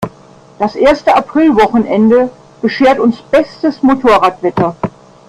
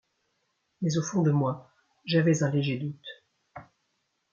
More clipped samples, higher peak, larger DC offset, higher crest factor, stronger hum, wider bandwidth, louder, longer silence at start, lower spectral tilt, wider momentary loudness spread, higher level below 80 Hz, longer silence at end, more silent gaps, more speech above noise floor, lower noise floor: neither; first, 0 dBFS vs -12 dBFS; neither; second, 12 dB vs 18 dB; neither; first, 11.5 kHz vs 7.4 kHz; first, -11 LUFS vs -27 LUFS; second, 0 s vs 0.8 s; about the same, -6.5 dB/octave vs -6 dB/octave; second, 10 LU vs 18 LU; first, -42 dBFS vs -70 dBFS; second, 0.4 s vs 0.7 s; neither; second, 30 dB vs 51 dB; second, -40 dBFS vs -77 dBFS